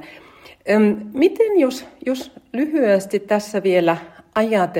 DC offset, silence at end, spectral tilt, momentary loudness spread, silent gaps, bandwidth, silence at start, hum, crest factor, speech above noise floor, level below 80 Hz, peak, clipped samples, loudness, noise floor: under 0.1%; 0 s; -6 dB/octave; 10 LU; none; 16.5 kHz; 0 s; none; 16 dB; 27 dB; -62 dBFS; -4 dBFS; under 0.1%; -19 LUFS; -45 dBFS